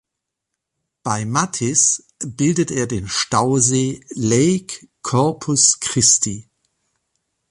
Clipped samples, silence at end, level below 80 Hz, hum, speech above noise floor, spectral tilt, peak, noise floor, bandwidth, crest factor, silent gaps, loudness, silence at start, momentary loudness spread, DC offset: under 0.1%; 1.1 s; -50 dBFS; none; 63 dB; -3.5 dB/octave; 0 dBFS; -81 dBFS; 11.5 kHz; 20 dB; none; -17 LUFS; 1.05 s; 11 LU; under 0.1%